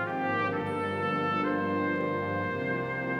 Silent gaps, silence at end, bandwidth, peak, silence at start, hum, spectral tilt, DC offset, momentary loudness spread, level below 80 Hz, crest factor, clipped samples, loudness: none; 0 s; 11.5 kHz; -18 dBFS; 0 s; 50 Hz at -50 dBFS; -7.5 dB/octave; under 0.1%; 3 LU; -66 dBFS; 12 dB; under 0.1%; -30 LUFS